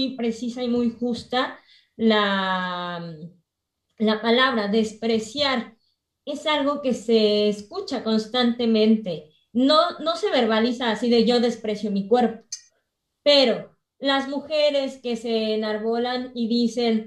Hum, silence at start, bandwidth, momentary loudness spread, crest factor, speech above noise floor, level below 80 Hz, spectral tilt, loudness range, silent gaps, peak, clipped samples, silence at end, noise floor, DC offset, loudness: none; 0 s; 11 kHz; 11 LU; 18 dB; 57 dB; -64 dBFS; -5 dB/octave; 3 LU; none; -6 dBFS; under 0.1%; 0 s; -79 dBFS; under 0.1%; -22 LUFS